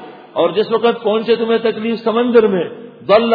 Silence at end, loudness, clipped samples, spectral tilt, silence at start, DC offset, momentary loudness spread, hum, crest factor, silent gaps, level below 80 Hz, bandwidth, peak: 0 s; -15 LUFS; under 0.1%; -8.5 dB/octave; 0 s; under 0.1%; 9 LU; none; 14 dB; none; -60 dBFS; 5 kHz; 0 dBFS